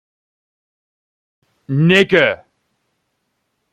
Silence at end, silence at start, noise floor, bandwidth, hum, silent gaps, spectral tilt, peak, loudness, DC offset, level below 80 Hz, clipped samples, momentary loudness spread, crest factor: 1.4 s; 1.7 s; -70 dBFS; 12.5 kHz; none; none; -6.5 dB/octave; 0 dBFS; -13 LUFS; under 0.1%; -58 dBFS; under 0.1%; 12 LU; 18 dB